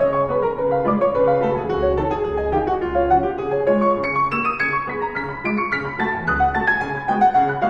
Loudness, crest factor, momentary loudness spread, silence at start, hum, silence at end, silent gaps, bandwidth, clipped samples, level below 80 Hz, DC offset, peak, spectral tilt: -20 LUFS; 14 dB; 5 LU; 0 s; none; 0 s; none; 7.6 kHz; under 0.1%; -38 dBFS; under 0.1%; -6 dBFS; -8 dB/octave